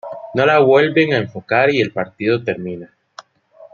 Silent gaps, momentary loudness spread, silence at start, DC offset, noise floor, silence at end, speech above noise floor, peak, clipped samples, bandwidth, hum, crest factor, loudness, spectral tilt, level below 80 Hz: none; 13 LU; 0.05 s; under 0.1%; -46 dBFS; 0.1 s; 30 dB; 0 dBFS; under 0.1%; 7 kHz; none; 16 dB; -16 LUFS; -7 dB/octave; -60 dBFS